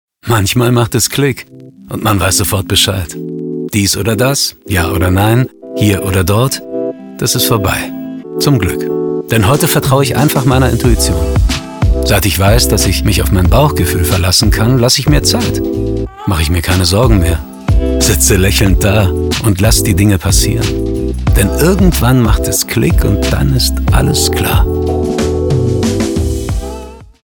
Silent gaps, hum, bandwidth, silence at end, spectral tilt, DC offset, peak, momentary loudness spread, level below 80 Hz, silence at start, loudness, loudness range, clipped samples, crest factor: none; none; over 20 kHz; 0.2 s; -4.5 dB/octave; under 0.1%; 0 dBFS; 8 LU; -18 dBFS; 0.25 s; -12 LUFS; 3 LU; under 0.1%; 12 dB